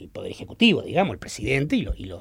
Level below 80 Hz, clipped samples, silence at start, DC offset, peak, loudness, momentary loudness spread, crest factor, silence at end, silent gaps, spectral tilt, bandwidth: -40 dBFS; under 0.1%; 0 s; under 0.1%; -6 dBFS; -23 LUFS; 16 LU; 18 dB; 0 s; none; -5.5 dB/octave; 15 kHz